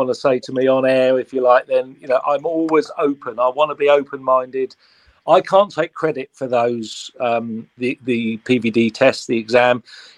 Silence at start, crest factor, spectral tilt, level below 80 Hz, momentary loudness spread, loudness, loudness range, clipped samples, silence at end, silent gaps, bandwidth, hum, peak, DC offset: 0 s; 18 dB; -5.5 dB/octave; -66 dBFS; 9 LU; -18 LUFS; 2 LU; under 0.1%; 0.15 s; none; 10.5 kHz; none; 0 dBFS; under 0.1%